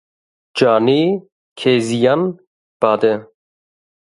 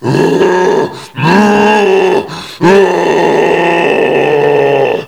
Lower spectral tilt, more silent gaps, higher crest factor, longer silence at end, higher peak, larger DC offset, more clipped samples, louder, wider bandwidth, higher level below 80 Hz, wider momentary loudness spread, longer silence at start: about the same, -6 dB/octave vs -6 dB/octave; first, 1.32-1.56 s, 2.47-2.80 s vs none; first, 18 dB vs 8 dB; first, 0.9 s vs 0 s; about the same, 0 dBFS vs 0 dBFS; second, under 0.1% vs 0.3%; second, under 0.1% vs 0.7%; second, -16 LUFS vs -9 LUFS; second, 11.5 kHz vs 15 kHz; second, -64 dBFS vs -48 dBFS; first, 10 LU vs 6 LU; first, 0.55 s vs 0 s